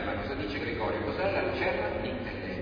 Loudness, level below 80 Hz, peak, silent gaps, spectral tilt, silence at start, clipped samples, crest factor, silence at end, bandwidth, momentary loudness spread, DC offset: -31 LUFS; -46 dBFS; -16 dBFS; none; -7.5 dB/octave; 0 s; under 0.1%; 16 dB; 0 s; 5.2 kHz; 5 LU; under 0.1%